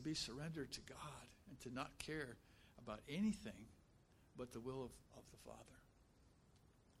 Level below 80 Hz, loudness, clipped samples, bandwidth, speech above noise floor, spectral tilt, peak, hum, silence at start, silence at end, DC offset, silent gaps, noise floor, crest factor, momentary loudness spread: -70 dBFS; -50 LUFS; under 0.1%; 15 kHz; 22 dB; -4.5 dB/octave; -32 dBFS; none; 0 s; 0.05 s; under 0.1%; none; -72 dBFS; 20 dB; 20 LU